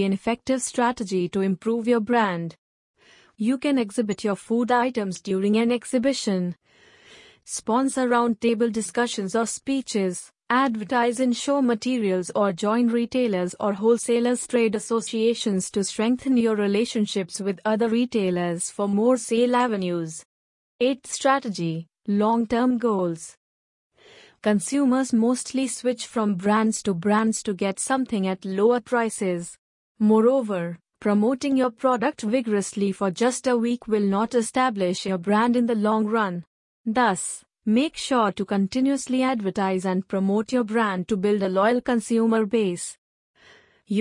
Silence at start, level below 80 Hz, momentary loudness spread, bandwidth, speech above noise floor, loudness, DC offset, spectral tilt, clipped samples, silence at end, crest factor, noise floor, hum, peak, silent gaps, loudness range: 0 s; -64 dBFS; 6 LU; 11 kHz; 32 dB; -23 LUFS; under 0.1%; -5 dB/octave; under 0.1%; 0 s; 16 dB; -55 dBFS; none; -6 dBFS; 2.58-2.94 s, 20.25-20.79 s, 23.37-23.90 s, 29.58-29.95 s, 36.47-36.84 s, 42.98-43.34 s; 2 LU